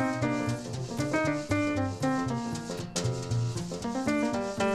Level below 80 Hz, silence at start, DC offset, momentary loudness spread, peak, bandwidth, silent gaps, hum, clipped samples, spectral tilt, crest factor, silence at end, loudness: -54 dBFS; 0 s; under 0.1%; 6 LU; -14 dBFS; 13.5 kHz; none; none; under 0.1%; -5.5 dB/octave; 16 dB; 0 s; -31 LUFS